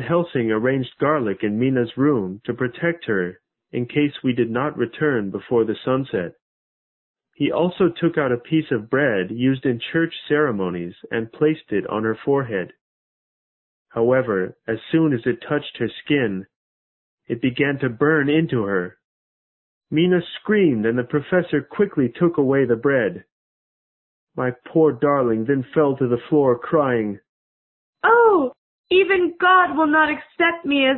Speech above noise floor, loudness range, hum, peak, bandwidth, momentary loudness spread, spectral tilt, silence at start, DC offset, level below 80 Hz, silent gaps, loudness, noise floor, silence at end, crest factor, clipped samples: over 70 dB; 5 LU; none; -4 dBFS; 4.2 kHz; 10 LU; -11.5 dB/octave; 0 s; under 0.1%; -58 dBFS; 6.42-7.14 s, 12.81-13.85 s, 16.56-17.18 s, 19.04-19.81 s, 23.32-24.27 s, 27.29-27.93 s, 28.58-28.84 s; -20 LUFS; under -90 dBFS; 0 s; 18 dB; under 0.1%